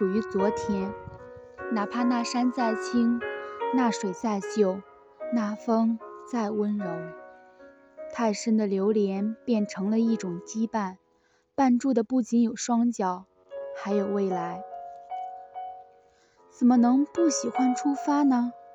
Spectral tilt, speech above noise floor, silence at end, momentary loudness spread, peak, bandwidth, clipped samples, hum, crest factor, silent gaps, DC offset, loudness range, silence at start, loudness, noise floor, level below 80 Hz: -5.5 dB/octave; 41 dB; 0 s; 16 LU; -12 dBFS; 8.6 kHz; under 0.1%; none; 16 dB; none; under 0.1%; 4 LU; 0 s; -27 LUFS; -67 dBFS; -66 dBFS